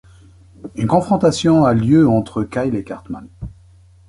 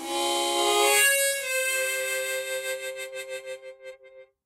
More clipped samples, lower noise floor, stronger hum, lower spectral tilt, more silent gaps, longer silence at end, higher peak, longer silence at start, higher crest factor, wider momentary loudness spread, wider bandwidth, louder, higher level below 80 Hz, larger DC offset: neither; second, -47 dBFS vs -52 dBFS; neither; first, -7 dB/octave vs 1.5 dB/octave; neither; first, 0.6 s vs 0.2 s; first, -2 dBFS vs -8 dBFS; first, 0.65 s vs 0 s; about the same, 16 dB vs 18 dB; first, 22 LU vs 19 LU; second, 11.5 kHz vs 16 kHz; first, -16 LUFS vs -24 LUFS; first, -42 dBFS vs -76 dBFS; neither